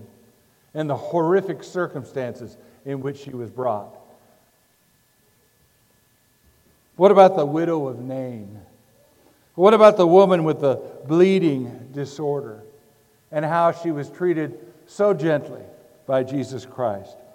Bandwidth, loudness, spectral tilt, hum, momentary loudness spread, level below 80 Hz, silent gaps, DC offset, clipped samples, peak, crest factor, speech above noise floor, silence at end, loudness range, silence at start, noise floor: 15.5 kHz; -20 LUFS; -7.5 dB/octave; none; 20 LU; -70 dBFS; none; under 0.1%; under 0.1%; 0 dBFS; 22 dB; 42 dB; 0.3 s; 15 LU; 0 s; -61 dBFS